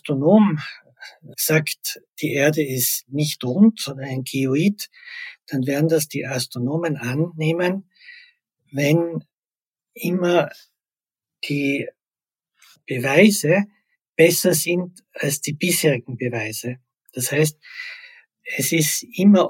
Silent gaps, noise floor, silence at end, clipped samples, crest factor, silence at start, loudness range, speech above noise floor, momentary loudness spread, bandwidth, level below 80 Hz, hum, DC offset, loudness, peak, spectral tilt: 9.34-9.51 s, 14.09-14.13 s; under -90 dBFS; 0 s; under 0.1%; 20 dB; 0.05 s; 5 LU; over 70 dB; 18 LU; 17 kHz; -70 dBFS; none; under 0.1%; -20 LUFS; -2 dBFS; -4.5 dB/octave